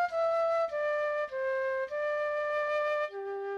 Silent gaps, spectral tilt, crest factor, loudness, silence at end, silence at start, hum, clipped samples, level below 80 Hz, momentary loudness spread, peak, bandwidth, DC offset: none; -3 dB/octave; 10 dB; -31 LUFS; 0 s; 0 s; none; under 0.1%; -70 dBFS; 4 LU; -22 dBFS; 8.2 kHz; under 0.1%